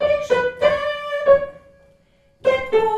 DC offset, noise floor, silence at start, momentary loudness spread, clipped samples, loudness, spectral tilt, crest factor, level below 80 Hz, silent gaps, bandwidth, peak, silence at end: under 0.1%; -57 dBFS; 0 s; 7 LU; under 0.1%; -19 LUFS; -4.5 dB/octave; 18 dB; -50 dBFS; none; 9.4 kHz; -2 dBFS; 0 s